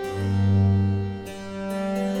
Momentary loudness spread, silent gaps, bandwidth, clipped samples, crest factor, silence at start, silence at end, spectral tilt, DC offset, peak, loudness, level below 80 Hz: 13 LU; none; 11 kHz; under 0.1%; 12 dB; 0 s; 0 s; -8 dB/octave; under 0.1%; -12 dBFS; -24 LUFS; -52 dBFS